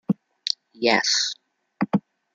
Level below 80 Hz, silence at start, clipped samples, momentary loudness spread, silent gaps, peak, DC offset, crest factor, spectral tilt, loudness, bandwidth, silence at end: -68 dBFS; 0.1 s; under 0.1%; 10 LU; none; -2 dBFS; under 0.1%; 24 dB; -3 dB/octave; -23 LUFS; 9.4 kHz; 0.35 s